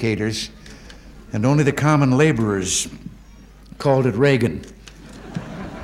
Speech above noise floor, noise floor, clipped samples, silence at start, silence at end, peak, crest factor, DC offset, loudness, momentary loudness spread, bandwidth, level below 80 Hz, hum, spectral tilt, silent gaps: 26 dB; -44 dBFS; under 0.1%; 0 s; 0 s; -2 dBFS; 18 dB; under 0.1%; -19 LUFS; 23 LU; 14.5 kHz; -44 dBFS; none; -5.5 dB/octave; none